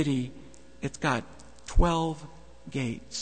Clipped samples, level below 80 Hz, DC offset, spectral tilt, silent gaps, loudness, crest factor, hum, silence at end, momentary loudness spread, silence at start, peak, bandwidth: under 0.1%; -34 dBFS; 0.4%; -5.5 dB/octave; none; -31 LUFS; 20 dB; none; 0 s; 23 LU; 0 s; -10 dBFS; 9.4 kHz